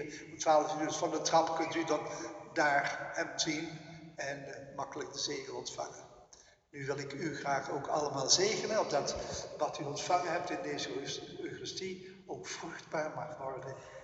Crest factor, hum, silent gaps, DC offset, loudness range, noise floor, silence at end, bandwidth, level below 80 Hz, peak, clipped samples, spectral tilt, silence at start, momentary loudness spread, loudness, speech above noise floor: 24 dB; none; none; under 0.1%; 8 LU; -62 dBFS; 0 s; 8.2 kHz; -68 dBFS; -12 dBFS; under 0.1%; -2.5 dB/octave; 0 s; 14 LU; -35 LUFS; 26 dB